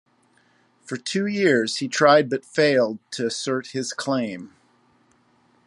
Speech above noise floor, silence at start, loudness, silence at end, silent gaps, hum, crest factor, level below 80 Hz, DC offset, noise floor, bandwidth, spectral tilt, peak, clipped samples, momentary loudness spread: 40 dB; 0.9 s; -22 LUFS; 1.2 s; none; none; 22 dB; -72 dBFS; under 0.1%; -62 dBFS; 11.5 kHz; -4 dB/octave; -2 dBFS; under 0.1%; 13 LU